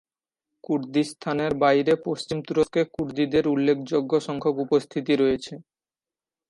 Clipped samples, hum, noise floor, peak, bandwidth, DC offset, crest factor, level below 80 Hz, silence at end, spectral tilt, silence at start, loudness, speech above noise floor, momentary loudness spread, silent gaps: under 0.1%; none; under -90 dBFS; -8 dBFS; 11.5 kHz; under 0.1%; 16 dB; -58 dBFS; 0.9 s; -6 dB/octave; 0.7 s; -24 LUFS; over 67 dB; 8 LU; none